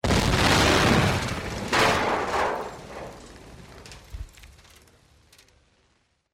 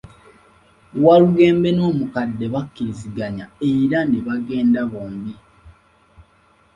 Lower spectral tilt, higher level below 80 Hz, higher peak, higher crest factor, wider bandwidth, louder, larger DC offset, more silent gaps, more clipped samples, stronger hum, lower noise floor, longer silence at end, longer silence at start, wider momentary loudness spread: second, -4 dB/octave vs -8.5 dB/octave; first, -38 dBFS vs -52 dBFS; second, -6 dBFS vs -2 dBFS; about the same, 20 dB vs 18 dB; first, 16 kHz vs 9.6 kHz; second, -22 LUFS vs -18 LUFS; neither; neither; neither; neither; first, -68 dBFS vs -56 dBFS; first, 1.85 s vs 1.05 s; second, 0.05 s vs 0.95 s; first, 26 LU vs 16 LU